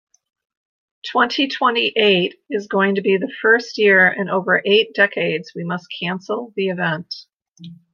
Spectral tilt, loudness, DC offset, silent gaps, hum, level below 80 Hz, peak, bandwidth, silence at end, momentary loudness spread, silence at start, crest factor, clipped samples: -5.5 dB/octave; -18 LUFS; under 0.1%; 7.48-7.53 s; none; -72 dBFS; -2 dBFS; 7.2 kHz; 0.2 s; 12 LU; 1.05 s; 18 dB; under 0.1%